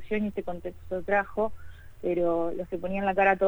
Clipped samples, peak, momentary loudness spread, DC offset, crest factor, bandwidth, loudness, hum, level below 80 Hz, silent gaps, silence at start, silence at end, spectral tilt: under 0.1%; -10 dBFS; 11 LU; under 0.1%; 18 dB; over 20 kHz; -29 LUFS; none; -50 dBFS; none; 0 s; 0 s; -8 dB/octave